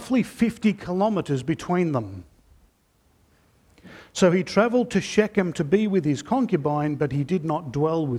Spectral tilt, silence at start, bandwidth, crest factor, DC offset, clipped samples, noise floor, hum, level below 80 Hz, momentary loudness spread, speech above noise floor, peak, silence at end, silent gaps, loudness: -6.5 dB/octave; 0 s; 13.5 kHz; 20 dB; under 0.1%; under 0.1%; -63 dBFS; none; -56 dBFS; 6 LU; 41 dB; -4 dBFS; 0 s; none; -23 LUFS